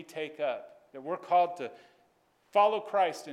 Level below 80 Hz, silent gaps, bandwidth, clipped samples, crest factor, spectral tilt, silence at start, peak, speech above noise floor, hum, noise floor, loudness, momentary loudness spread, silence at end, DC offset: -88 dBFS; none; 14 kHz; under 0.1%; 18 dB; -4 dB/octave; 0 s; -14 dBFS; 39 dB; none; -69 dBFS; -30 LUFS; 16 LU; 0 s; under 0.1%